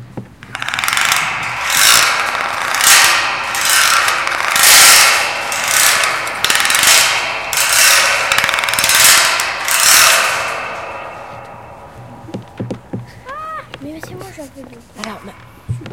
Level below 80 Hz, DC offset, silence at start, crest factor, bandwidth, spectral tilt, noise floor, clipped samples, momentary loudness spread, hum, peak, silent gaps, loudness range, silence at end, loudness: -48 dBFS; 0.2%; 0 s; 14 dB; over 20 kHz; 0.5 dB/octave; -36 dBFS; 0.4%; 23 LU; none; 0 dBFS; none; 20 LU; 0 s; -10 LUFS